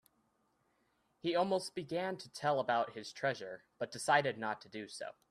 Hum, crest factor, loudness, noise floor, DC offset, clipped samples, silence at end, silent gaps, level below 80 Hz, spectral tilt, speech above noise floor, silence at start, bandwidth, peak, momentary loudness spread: none; 22 dB; -37 LUFS; -77 dBFS; under 0.1%; under 0.1%; 0.2 s; none; -80 dBFS; -4 dB/octave; 41 dB; 1.25 s; 14.5 kHz; -16 dBFS; 13 LU